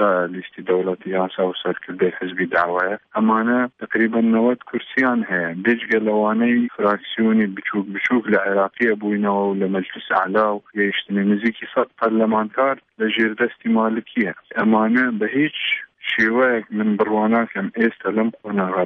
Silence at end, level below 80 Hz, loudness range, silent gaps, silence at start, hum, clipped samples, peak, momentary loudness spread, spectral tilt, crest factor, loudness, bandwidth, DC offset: 0 s; -66 dBFS; 1 LU; none; 0 s; none; under 0.1%; -4 dBFS; 6 LU; -8 dB/octave; 14 dB; -20 LUFS; 6 kHz; under 0.1%